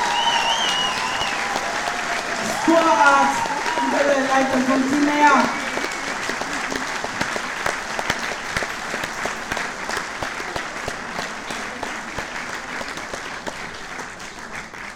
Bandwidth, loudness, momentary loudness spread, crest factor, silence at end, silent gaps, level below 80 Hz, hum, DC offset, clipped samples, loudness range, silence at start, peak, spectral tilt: 19 kHz; -21 LUFS; 13 LU; 20 dB; 0 s; none; -48 dBFS; none; under 0.1%; under 0.1%; 11 LU; 0 s; -2 dBFS; -2.5 dB/octave